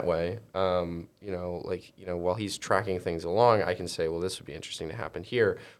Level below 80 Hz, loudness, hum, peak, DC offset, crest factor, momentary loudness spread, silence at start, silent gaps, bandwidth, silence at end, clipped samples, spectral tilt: -56 dBFS; -30 LUFS; none; -8 dBFS; under 0.1%; 22 dB; 13 LU; 0 s; none; 14 kHz; 0.05 s; under 0.1%; -5 dB/octave